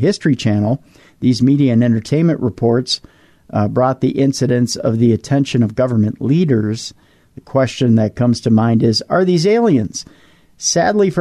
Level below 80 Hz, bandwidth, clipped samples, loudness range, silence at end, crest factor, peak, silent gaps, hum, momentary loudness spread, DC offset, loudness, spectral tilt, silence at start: -50 dBFS; 12.5 kHz; under 0.1%; 2 LU; 0 s; 12 dB; -4 dBFS; none; none; 7 LU; under 0.1%; -15 LUFS; -6 dB/octave; 0 s